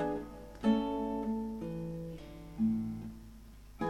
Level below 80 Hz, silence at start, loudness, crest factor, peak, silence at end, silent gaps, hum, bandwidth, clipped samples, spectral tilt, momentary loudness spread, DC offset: -54 dBFS; 0 s; -36 LUFS; 18 dB; -18 dBFS; 0 s; none; 50 Hz at -55 dBFS; 13 kHz; under 0.1%; -8 dB/octave; 19 LU; under 0.1%